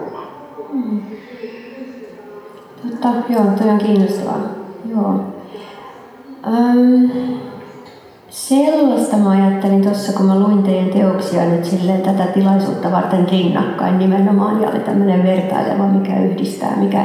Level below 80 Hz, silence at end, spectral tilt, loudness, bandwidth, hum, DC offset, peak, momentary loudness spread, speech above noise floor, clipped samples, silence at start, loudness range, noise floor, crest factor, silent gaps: -64 dBFS; 0 s; -7.5 dB/octave; -15 LUFS; 13.5 kHz; none; under 0.1%; -2 dBFS; 19 LU; 26 dB; under 0.1%; 0 s; 4 LU; -40 dBFS; 14 dB; none